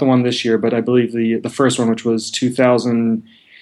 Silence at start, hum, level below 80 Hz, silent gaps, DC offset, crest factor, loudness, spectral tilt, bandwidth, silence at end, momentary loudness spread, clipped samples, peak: 0 s; none; -64 dBFS; none; under 0.1%; 14 dB; -17 LUFS; -5.5 dB/octave; 12 kHz; 0.4 s; 5 LU; under 0.1%; -2 dBFS